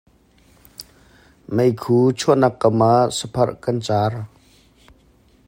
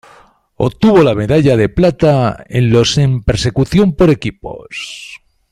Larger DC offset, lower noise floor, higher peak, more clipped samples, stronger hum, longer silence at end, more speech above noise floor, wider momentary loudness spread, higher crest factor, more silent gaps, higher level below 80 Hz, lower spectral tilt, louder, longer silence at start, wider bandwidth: neither; first, -54 dBFS vs -46 dBFS; about the same, -2 dBFS vs 0 dBFS; neither; neither; first, 1.2 s vs 0.35 s; about the same, 37 dB vs 34 dB; first, 23 LU vs 15 LU; first, 18 dB vs 12 dB; neither; second, -54 dBFS vs -32 dBFS; about the same, -6.5 dB/octave vs -6.5 dB/octave; second, -18 LUFS vs -12 LUFS; first, 0.8 s vs 0.6 s; first, 16 kHz vs 12.5 kHz